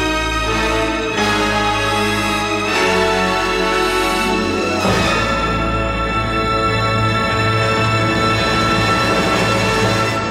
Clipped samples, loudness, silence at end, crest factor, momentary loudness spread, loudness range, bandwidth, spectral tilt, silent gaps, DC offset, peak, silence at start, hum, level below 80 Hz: under 0.1%; -16 LUFS; 0 s; 14 dB; 3 LU; 1 LU; 16 kHz; -4.5 dB/octave; none; under 0.1%; -2 dBFS; 0 s; none; -30 dBFS